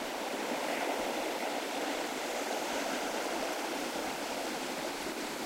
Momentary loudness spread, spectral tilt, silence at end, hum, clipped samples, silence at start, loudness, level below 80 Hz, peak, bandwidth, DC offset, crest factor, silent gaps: 3 LU; -2 dB/octave; 0 s; none; under 0.1%; 0 s; -35 LUFS; -68 dBFS; -22 dBFS; 16 kHz; under 0.1%; 14 dB; none